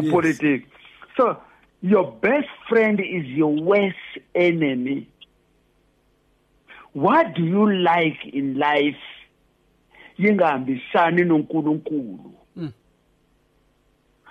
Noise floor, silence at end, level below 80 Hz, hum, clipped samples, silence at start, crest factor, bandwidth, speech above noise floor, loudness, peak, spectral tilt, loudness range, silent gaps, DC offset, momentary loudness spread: -63 dBFS; 1.6 s; -64 dBFS; none; under 0.1%; 0 s; 16 dB; 9.2 kHz; 43 dB; -21 LUFS; -6 dBFS; -7.5 dB/octave; 3 LU; none; under 0.1%; 17 LU